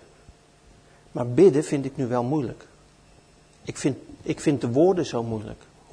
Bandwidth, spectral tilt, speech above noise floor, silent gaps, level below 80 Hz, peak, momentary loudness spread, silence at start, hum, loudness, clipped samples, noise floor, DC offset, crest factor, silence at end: 10.5 kHz; -7 dB/octave; 31 dB; none; -56 dBFS; -6 dBFS; 19 LU; 1.15 s; none; -24 LUFS; under 0.1%; -55 dBFS; under 0.1%; 20 dB; 0.4 s